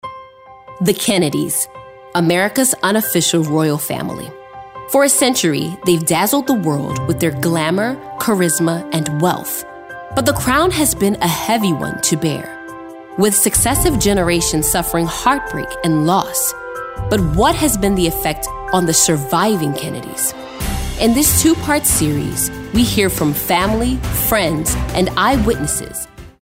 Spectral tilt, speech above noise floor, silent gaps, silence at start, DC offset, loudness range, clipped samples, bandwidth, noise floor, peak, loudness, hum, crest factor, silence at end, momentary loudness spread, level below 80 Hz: -4 dB/octave; 24 dB; none; 0.05 s; under 0.1%; 2 LU; under 0.1%; 16.5 kHz; -39 dBFS; 0 dBFS; -16 LUFS; none; 16 dB; 0.1 s; 11 LU; -32 dBFS